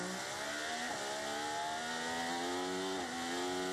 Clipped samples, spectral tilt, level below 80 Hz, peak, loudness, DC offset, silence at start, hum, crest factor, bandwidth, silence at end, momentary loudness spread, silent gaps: under 0.1%; -2 dB/octave; -74 dBFS; -28 dBFS; -38 LUFS; under 0.1%; 0 s; none; 12 dB; 16 kHz; 0 s; 2 LU; none